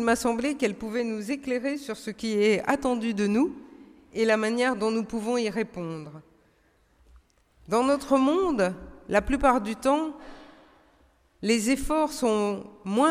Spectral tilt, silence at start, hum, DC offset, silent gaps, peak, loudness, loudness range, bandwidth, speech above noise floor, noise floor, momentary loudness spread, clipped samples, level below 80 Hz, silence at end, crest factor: -4.5 dB/octave; 0 s; none; under 0.1%; none; -8 dBFS; -26 LUFS; 3 LU; 15.5 kHz; 39 dB; -64 dBFS; 12 LU; under 0.1%; -48 dBFS; 0 s; 20 dB